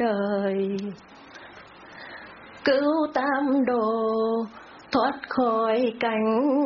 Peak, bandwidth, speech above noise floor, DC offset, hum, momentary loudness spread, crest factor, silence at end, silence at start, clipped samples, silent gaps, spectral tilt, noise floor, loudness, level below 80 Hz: -10 dBFS; 6.6 kHz; 22 dB; under 0.1%; none; 21 LU; 16 dB; 0 s; 0 s; under 0.1%; none; -4 dB/octave; -46 dBFS; -24 LUFS; -66 dBFS